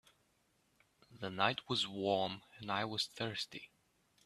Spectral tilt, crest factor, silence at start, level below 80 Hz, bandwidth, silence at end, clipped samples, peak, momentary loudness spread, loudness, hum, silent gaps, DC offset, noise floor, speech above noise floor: -4 dB/octave; 26 dB; 1.1 s; -78 dBFS; 14 kHz; 0.6 s; under 0.1%; -14 dBFS; 11 LU; -38 LUFS; none; none; under 0.1%; -76 dBFS; 38 dB